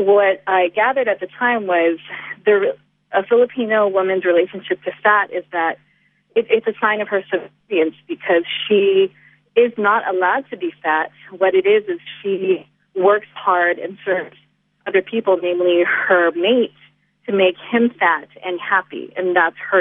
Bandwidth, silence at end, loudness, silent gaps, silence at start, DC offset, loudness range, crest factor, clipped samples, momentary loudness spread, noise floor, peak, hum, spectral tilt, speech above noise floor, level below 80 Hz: 3.8 kHz; 0 s; -18 LUFS; none; 0 s; under 0.1%; 2 LU; 16 dB; under 0.1%; 9 LU; -60 dBFS; -2 dBFS; none; -8.5 dB/octave; 42 dB; -74 dBFS